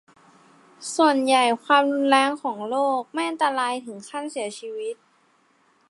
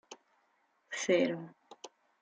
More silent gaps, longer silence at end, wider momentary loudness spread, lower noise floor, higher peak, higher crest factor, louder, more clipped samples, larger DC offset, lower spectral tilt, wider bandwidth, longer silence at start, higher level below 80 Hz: neither; first, 0.95 s vs 0.35 s; second, 14 LU vs 24 LU; second, -62 dBFS vs -74 dBFS; first, -2 dBFS vs -16 dBFS; about the same, 22 dB vs 20 dB; first, -22 LUFS vs -33 LUFS; neither; neither; second, -2.5 dB/octave vs -4 dB/octave; first, 11.5 kHz vs 9.4 kHz; first, 0.8 s vs 0.1 s; about the same, -82 dBFS vs -86 dBFS